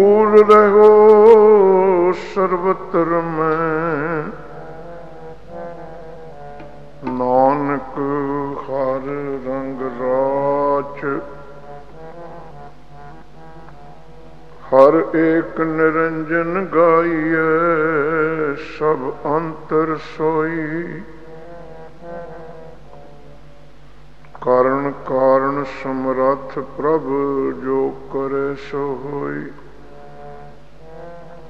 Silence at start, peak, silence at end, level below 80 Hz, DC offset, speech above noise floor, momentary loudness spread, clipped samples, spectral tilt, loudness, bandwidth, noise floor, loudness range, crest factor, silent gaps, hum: 0 s; 0 dBFS; 0 s; -48 dBFS; 2%; 29 dB; 26 LU; under 0.1%; -8.5 dB/octave; -16 LUFS; 6.4 kHz; -45 dBFS; 13 LU; 18 dB; none; none